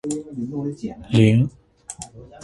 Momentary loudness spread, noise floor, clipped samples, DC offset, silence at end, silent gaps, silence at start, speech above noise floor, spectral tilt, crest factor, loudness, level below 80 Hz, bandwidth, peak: 22 LU; -40 dBFS; under 0.1%; under 0.1%; 0 s; none; 0.05 s; 21 dB; -6.5 dB/octave; 20 dB; -21 LUFS; -50 dBFS; 11.5 kHz; -2 dBFS